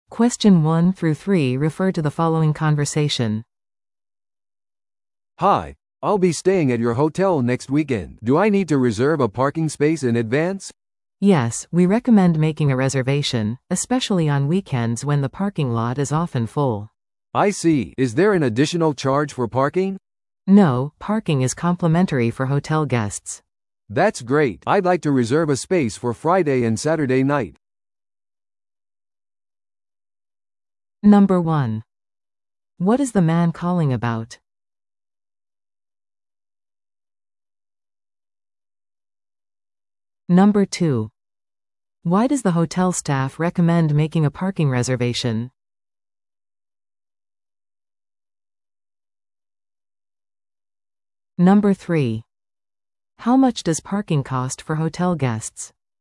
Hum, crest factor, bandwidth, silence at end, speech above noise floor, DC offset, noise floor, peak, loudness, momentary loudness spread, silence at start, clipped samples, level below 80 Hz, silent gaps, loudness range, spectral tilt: none; 18 dB; 12 kHz; 0.35 s; over 72 dB; under 0.1%; under -90 dBFS; -4 dBFS; -19 LUFS; 9 LU; 0.1 s; under 0.1%; -54 dBFS; none; 5 LU; -6.5 dB/octave